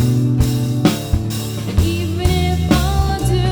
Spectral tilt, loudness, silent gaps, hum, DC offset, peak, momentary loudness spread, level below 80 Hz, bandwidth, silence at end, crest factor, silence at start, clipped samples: -6 dB/octave; -17 LUFS; none; none; under 0.1%; -2 dBFS; 5 LU; -24 dBFS; over 20 kHz; 0 s; 14 dB; 0 s; under 0.1%